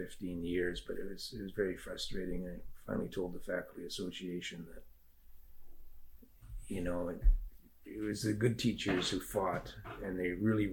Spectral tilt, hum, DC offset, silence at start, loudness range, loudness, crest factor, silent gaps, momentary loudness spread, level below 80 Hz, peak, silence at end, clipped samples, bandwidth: -5.5 dB/octave; none; under 0.1%; 0 s; 9 LU; -38 LUFS; 20 dB; none; 15 LU; -44 dBFS; -18 dBFS; 0 s; under 0.1%; 17.5 kHz